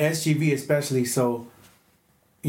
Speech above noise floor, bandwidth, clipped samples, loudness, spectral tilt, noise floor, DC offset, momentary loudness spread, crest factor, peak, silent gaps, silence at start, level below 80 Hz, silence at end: 40 dB; 17 kHz; under 0.1%; -24 LUFS; -5.5 dB/octave; -63 dBFS; under 0.1%; 4 LU; 16 dB; -8 dBFS; none; 0 s; -72 dBFS; 0 s